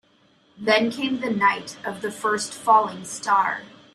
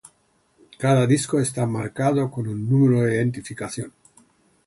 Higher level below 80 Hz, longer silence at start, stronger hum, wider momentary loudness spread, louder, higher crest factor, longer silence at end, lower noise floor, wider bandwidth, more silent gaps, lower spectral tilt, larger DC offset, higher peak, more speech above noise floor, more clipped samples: second, -70 dBFS vs -58 dBFS; second, 0.6 s vs 0.8 s; neither; about the same, 11 LU vs 13 LU; about the same, -22 LUFS vs -22 LUFS; about the same, 20 dB vs 16 dB; second, 0.25 s vs 0.75 s; second, -60 dBFS vs -64 dBFS; first, 14 kHz vs 11.5 kHz; neither; second, -3 dB/octave vs -6.5 dB/octave; neither; about the same, -4 dBFS vs -6 dBFS; second, 37 dB vs 43 dB; neither